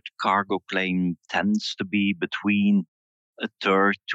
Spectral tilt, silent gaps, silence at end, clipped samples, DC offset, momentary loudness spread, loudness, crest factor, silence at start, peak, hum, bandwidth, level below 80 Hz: -6 dB/octave; 2.88-3.34 s; 0 s; under 0.1%; under 0.1%; 6 LU; -24 LUFS; 16 dB; 0.05 s; -8 dBFS; none; 7.8 kHz; -72 dBFS